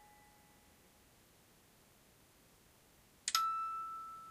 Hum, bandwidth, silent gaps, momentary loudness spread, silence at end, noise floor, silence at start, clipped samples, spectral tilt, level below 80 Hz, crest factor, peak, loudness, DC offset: none; 15.5 kHz; none; 25 LU; 0 s; -67 dBFS; 0 s; under 0.1%; 1 dB/octave; -78 dBFS; 30 dB; -16 dBFS; -38 LUFS; under 0.1%